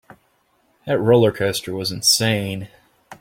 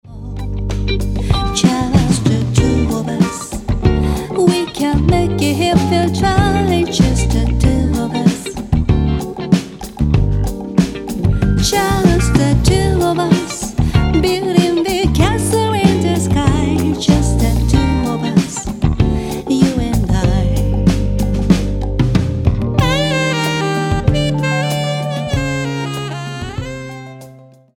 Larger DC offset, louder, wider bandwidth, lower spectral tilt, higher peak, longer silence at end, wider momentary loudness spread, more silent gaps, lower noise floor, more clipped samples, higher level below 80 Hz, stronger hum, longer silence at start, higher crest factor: neither; second, -18 LUFS vs -15 LUFS; about the same, 16.5 kHz vs 18 kHz; second, -4 dB/octave vs -6 dB/octave; about the same, -2 dBFS vs 0 dBFS; second, 0.05 s vs 0.4 s; first, 17 LU vs 7 LU; neither; first, -63 dBFS vs -40 dBFS; neither; second, -56 dBFS vs -22 dBFS; neither; first, 0.85 s vs 0.05 s; about the same, 18 dB vs 14 dB